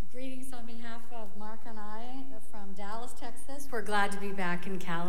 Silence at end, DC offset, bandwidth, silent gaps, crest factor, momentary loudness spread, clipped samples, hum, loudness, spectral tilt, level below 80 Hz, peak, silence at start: 0 s; 8%; 16 kHz; none; 20 dB; 15 LU; under 0.1%; none; -38 LUFS; -5 dB/octave; -62 dBFS; -14 dBFS; 0 s